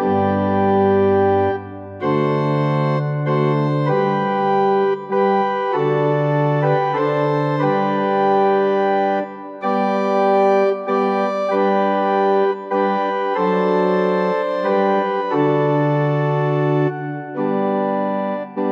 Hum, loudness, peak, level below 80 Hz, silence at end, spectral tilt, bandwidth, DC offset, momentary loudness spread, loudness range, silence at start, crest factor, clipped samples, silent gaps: none; -18 LUFS; -4 dBFS; -66 dBFS; 0 s; -9 dB/octave; 6.2 kHz; under 0.1%; 5 LU; 1 LU; 0 s; 12 dB; under 0.1%; none